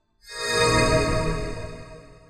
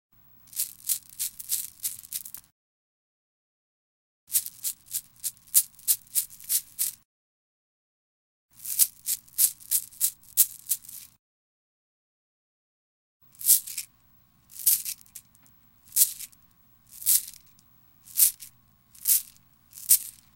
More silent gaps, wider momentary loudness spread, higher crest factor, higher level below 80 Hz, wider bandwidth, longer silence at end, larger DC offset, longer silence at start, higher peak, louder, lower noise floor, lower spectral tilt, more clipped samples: second, none vs 2.52-4.27 s, 7.05-8.49 s, 11.19-13.20 s; about the same, 19 LU vs 19 LU; second, 18 dB vs 30 dB; first, -34 dBFS vs -72 dBFS; second, 14.5 kHz vs 17 kHz; about the same, 0.15 s vs 0.25 s; neither; second, 0.25 s vs 0.55 s; second, -8 dBFS vs 0 dBFS; first, -22 LUFS vs -25 LUFS; second, -43 dBFS vs -61 dBFS; first, -4 dB/octave vs 3.5 dB/octave; neither